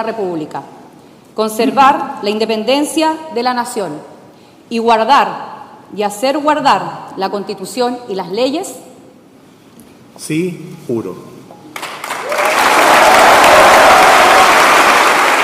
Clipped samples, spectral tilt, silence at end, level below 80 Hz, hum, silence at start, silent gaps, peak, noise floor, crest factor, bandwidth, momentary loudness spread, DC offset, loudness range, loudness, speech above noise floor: under 0.1%; -2.5 dB/octave; 0 s; -48 dBFS; none; 0 s; none; 0 dBFS; -42 dBFS; 12 dB; 16.5 kHz; 20 LU; under 0.1%; 15 LU; -11 LUFS; 27 dB